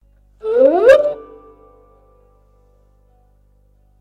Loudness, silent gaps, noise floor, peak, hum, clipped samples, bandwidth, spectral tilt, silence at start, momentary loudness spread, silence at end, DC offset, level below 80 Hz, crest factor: -12 LUFS; none; -54 dBFS; -2 dBFS; 50 Hz at -55 dBFS; under 0.1%; 9.6 kHz; -5 dB/octave; 0.45 s; 19 LU; 2.8 s; under 0.1%; -52 dBFS; 18 dB